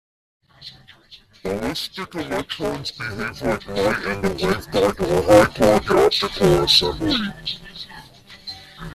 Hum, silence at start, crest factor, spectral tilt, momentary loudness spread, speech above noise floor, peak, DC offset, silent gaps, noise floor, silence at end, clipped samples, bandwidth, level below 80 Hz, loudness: none; 0.6 s; 20 dB; -4.5 dB/octave; 21 LU; 29 dB; -2 dBFS; under 0.1%; none; -49 dBFS; 0 s; under 0.1%; 15 kHz; -42 dBFS; -19 LUFS